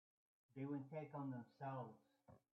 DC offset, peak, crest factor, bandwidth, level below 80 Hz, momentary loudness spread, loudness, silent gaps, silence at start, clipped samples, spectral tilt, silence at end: under 0.1%; -38 dBFS; 14 dB; 6 kHz; under -90 dBFS; 6 LU; -52 LUFS; none; 0.55 s; under 0.1%; -8.5 dB/octave; 0.15 s